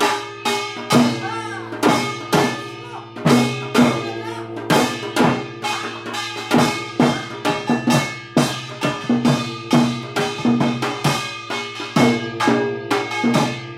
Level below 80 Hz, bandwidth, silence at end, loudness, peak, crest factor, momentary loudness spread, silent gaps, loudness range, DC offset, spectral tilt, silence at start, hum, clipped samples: -56 dBFS; 16 kHz; 0 s; -20 LUFS; -2 dBFS; 18 dB; 9 LU; none; 1 LU; under 0.1%; -5 dB/octave; 0 s; none; under 0.1%